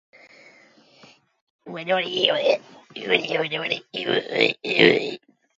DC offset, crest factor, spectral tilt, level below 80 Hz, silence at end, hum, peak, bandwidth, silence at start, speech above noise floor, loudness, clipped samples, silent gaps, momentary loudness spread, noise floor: under 0.1%; 24 dB; -4.5 dB/octave; -74 dBFS; 0.4 s; none; 0 dBFS; 7.8 kHz; 1.65 s; 32 dB; -21 LUFS; under 0.1%; none; 17 LU; -54 dBFS